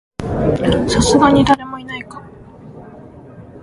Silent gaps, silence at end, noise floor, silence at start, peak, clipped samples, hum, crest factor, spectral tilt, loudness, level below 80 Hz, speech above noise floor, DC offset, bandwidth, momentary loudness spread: none; 0 s; -38 dBFS; 0.2 s; 0 dBFS; under 0.1%; none; 16 dB; -5 dB/octave; -14 LUFS; -34 dBFS; 25 dB; under 0.1%; 11.5 kHz; 24 LU